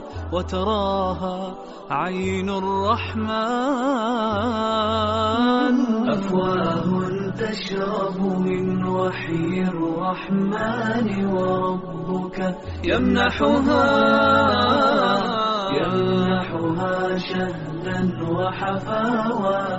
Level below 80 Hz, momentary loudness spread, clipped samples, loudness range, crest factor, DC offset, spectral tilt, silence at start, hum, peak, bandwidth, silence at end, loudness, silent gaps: -44 dBFS; 9 LU; under 0.1%; 5 LU; 16 dB; under 0.1%; -4.5 dB/octave; 0 s; none; -6 dBFS; 8 kHz; 0 s; -22 LUFS; none